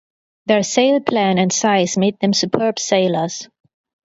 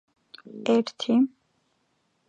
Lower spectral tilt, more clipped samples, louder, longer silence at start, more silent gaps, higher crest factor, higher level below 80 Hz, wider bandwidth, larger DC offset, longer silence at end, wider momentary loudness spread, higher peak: second, -4 dB/octave vs -5.5 dB/octave; neither; first, -17 LUFS vs -25 LUFS; about the same, 0.45 s vs 0.5 s; neither; about the same, 18 dB vs 18 dB; first, -62 dBFS vs -80 dBFS; about the same, 8 kHz vs 8 kHz; neither; second, 0.6 s vs 1 s; second, 6 LU vs 9 LU; first, 0 dBFS vs -10 dBFS